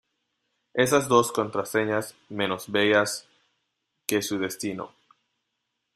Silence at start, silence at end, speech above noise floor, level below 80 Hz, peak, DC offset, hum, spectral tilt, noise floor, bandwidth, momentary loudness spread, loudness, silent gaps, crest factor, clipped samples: 0.75 s; 1.1 s; 55 dB; -68 dBFS; -4 dBFS; under 0.1%; none; -3.5 dB/octave; -80 dBFS; 15 kHz; 15 LU; -25 LUFS; none; 24 dB; under 0.1%